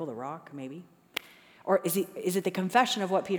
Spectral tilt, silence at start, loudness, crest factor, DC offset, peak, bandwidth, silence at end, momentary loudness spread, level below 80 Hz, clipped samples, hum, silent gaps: -4.5 dB/octave; 0 s; -29 LUFS; 22 dB; under 0.1%; -8 dBFS; over 20 kHz; 0 s; 16 LU; -80 dBFS; under 0.1%; none; none